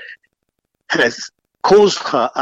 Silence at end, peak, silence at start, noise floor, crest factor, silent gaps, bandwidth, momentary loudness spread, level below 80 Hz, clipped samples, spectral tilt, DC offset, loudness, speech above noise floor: 0 s; -2 dBFS; 0 s; -72 dBFS; 14 dB; none; 8 kHz; 15 LU; -56 dBFS; under 0.1%; -3.5 dB/octave; under 0.1%; -15 LUFS; 58 dB